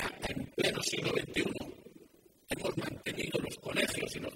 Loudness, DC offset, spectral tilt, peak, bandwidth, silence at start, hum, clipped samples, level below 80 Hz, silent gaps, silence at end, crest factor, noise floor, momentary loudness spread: -35 LUFS; under 0.1%; -3.5 dB/octave; -16 dBFS; 16 kHz; 0 s; none; under 0.1%; -58 dBFS; none; 0 s; 20 dB; -61 dBFS; 8 LU